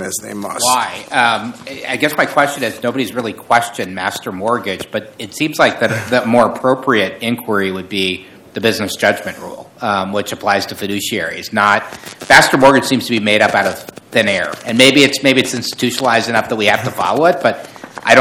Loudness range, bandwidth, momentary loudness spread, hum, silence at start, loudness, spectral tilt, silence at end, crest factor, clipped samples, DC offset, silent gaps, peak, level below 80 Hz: 6 LU; over 20 kHz; 13 LU; none; 0 s; -14 LUFS; -3.5 dB/octave; 0 s; 14 dB; 0.5%; under 0.1%; none; 0 dBFS; -54 dBFS